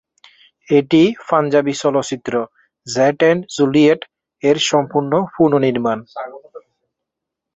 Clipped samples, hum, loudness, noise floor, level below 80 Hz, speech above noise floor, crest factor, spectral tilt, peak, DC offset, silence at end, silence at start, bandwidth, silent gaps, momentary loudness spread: under 0.1%; none; -16 LUFS; -82 dBFS; -58 dBFS; 66 dB; 16 dB; -5 dB/octave; -2 dBFS; under 0.1%; 1 s; 0.7 s; 8 kHz; none; 13 LU